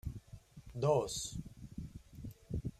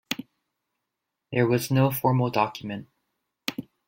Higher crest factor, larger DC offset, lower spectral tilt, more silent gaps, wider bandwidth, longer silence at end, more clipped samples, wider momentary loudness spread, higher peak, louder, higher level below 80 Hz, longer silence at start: about the same, 22 dB vs 20 dB; neither; about the same, -5.5 dB/octave vs -6 dB/octave; neither; about the same, 15.5 kHz vs 16.5 kHz; second, 0.1 s vs 0.25 s; neither; first, 20 LU vs 13 LU; second, -18 dBFS vs -8 dBFS; second, -38 LUFS vs -26 LUFS; first, -54 dBFS vs -62 dBFS; about the same, 0.05 s vs 0.1 s